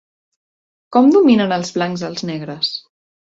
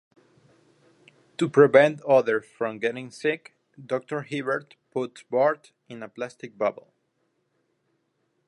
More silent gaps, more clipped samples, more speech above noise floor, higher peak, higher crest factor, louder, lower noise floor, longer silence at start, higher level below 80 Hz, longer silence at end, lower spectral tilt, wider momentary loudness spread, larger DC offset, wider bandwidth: neither; neither; first, over 75 dB vs 49 dB; about the same, -2 dBFS vs -4 dBFS; second, 16 dB vs 22 dB; first, -16 LUFS vs -24 LUFS; first, under -90 dBFS vs -73 dBFS; second, 0.9 s vs 1.4 s; first, -60 dBFS vs -80 dBFS; second, 0.45 s vs 1.75 s; about the same, -5.5 dB/octave vs -6 dB/octave; second, 14 LU vs 18 LU; neither; second, 8 kHz vs 11 kHz